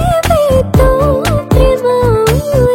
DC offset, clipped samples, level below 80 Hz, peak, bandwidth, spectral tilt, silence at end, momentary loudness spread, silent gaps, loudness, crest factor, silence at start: under 0.1%; under 0.1%; -18 dBFS; 0 dBFS; 17 kHz; -6.5 dB/octave; 0 s; 2 LU; none; -11 LUFS; 10 dB; 0 s